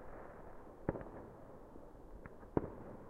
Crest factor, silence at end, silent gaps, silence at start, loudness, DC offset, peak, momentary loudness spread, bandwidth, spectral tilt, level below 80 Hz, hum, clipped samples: 30 dB; 0 s; none; 0 s; -48 LUFS; under 0.1%; -16 dBFS; 15 LU; 16 kHz; -9.5 dB/octave; -58 dBFS; none; under 0.1%